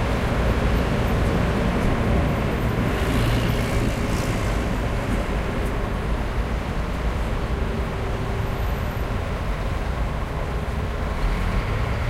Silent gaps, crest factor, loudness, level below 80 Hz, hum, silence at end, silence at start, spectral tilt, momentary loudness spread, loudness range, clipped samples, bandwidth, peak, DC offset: none; 14 dB; -24 LUFS; -26 dBFS; none; 0 s; 0 s; -6.5 dB/octave; 5 LU; 4 LU; under 0.1%; 15.5 kHz; -8 dBFS; under 0.1%